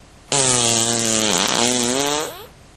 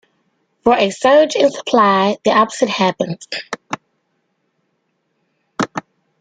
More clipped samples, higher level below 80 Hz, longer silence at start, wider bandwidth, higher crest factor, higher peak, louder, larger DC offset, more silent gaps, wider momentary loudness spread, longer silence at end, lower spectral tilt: neither; first, -50 dBFS vs -58 dBFS; second, 0.3 s vs 0.65 s; first, 15.5 kHz vs 9.4 kHz; about the same, 20 dB vs 16 dB; about the same, 0 dBFS vs -2 dBFS; about the same, -17 LUFS vs -16 LUFS; neither; neither; second, 7 LU vs 15 LU; about the same, 0.3 s vs 0.4 s; second, -1.5 dB/octave vs -4.5 dB/octave